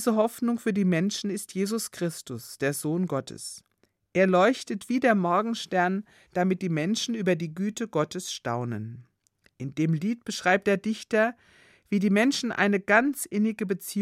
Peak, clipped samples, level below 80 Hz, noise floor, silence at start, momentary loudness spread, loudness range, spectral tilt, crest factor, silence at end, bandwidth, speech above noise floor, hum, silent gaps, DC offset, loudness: -6 dBFS; under 0.1%; -72 dBFS; -67 dBFS; 0 s; 11 LU; 5 LU; -5 dB/octave; 20 dB; 0 s; 15.5 kHz; 41 dB; none; none; under 0.1%; -26 LUFS